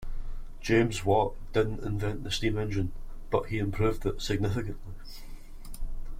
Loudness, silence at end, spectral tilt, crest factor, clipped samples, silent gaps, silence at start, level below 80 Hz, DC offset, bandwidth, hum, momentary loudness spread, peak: -30 LUFS; 0 s; -6 dB/octave; 18 dB; under 0.1%; none; 0 s; -38 dBFS; under 0.1%; 15.5 kHz; none; 20 LU; -12 dBFS